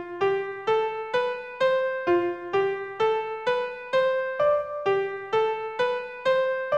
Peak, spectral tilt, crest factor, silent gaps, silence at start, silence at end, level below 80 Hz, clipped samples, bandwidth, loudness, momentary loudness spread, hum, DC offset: -12 dBFS; -5 dB/octave; 14 dB; none; 0 s; 0 s; -66 dBFS; under 0.1%; 8.2 kHz; -26 LUFS; 4 LU; none; under 0.1%